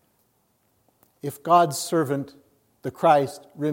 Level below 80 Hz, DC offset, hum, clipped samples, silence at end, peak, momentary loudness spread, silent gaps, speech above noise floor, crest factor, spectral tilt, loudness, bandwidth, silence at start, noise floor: -74 dBFS; under 0.1%; none; under 0.1%; 0 s; -6 dBFS; 17 LU; none; 45 dB; 20 dB; -5 dB/octave; -22 LUFS; 16.5 kHz; 1.25 s; -68 dBFS